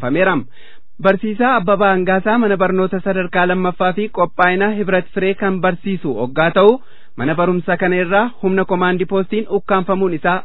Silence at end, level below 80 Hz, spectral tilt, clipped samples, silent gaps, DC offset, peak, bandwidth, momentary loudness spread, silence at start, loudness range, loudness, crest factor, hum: 0 s; -48 dBFS; -10 dB/octave; under 0.1%; none; 4%; 0 dBFS; 4.1 kHz; 6 LU; 0 s; 1 LU; -16 LUFS; 16 dB; none